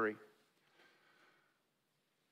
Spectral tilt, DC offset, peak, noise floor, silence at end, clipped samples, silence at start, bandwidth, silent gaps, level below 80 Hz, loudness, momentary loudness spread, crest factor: -6.5 dB/octave; under 0.1%; -26 dBFS; -82 dBFS; 2.05 s; under 0.1%; 0 s; 13.5 kHz; none; under -90 dBFS; -44 LUFS; 22 LU; 24 dB